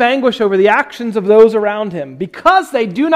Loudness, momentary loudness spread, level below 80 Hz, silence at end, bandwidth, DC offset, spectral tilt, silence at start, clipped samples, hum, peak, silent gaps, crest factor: -12 LUFS; 12 LU; -52 dBFS; 0 s; 12.5 kHz; under 0.1%; -5.5 dB/octave; 0 s; 0.6%; none; 0 dBFS; none; 12 dB